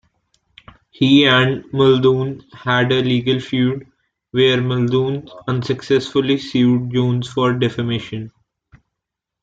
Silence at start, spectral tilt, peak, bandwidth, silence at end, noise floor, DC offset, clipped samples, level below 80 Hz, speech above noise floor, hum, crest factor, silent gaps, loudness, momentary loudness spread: 1 s; -7 dB/octave; -2 dBFS; 7.8 kHz; 1.15 s; -81 dBFS; under 0.1%; under 0.1%; -54 dBFS; 65 dB; none; 16 dB; none; -17 LUFS; 11 LU